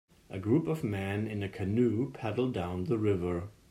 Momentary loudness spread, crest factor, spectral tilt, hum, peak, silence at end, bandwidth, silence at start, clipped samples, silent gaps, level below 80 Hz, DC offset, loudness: 7 LU; 16 dB; -8.5 dB/octave; none; -16 dBFS; 0.2 s; 14 kHz; 0.3 s; under 0.1%; none; -62 dBFS; under 0.1%; -32 LUFS